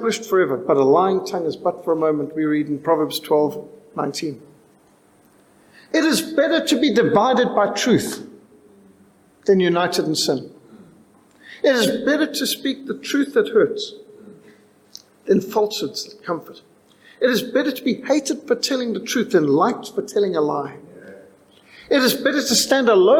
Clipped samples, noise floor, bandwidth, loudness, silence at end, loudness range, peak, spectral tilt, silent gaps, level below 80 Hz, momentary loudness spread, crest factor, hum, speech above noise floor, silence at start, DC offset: under 0.1%; -55 dBFS; 18 kHz; -19 LUFS; 0 s; 5 LU; -4 dBFS; -4 dB/octave; none; -64 dBFS; 12 LU; 16 dB; none; 36 dB; 0 s; under 0.1%